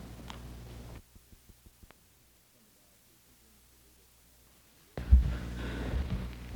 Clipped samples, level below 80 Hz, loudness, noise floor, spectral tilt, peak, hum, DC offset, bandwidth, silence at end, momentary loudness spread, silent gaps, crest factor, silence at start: under 0.1%; -36 dBFS; -34 LUFS; -64 dBFS; -7 dB/octave; -10 dBFS; none; under 0.1%; 19.5 kHz; 0 s; 24 LU; none; 26 dB; 0 s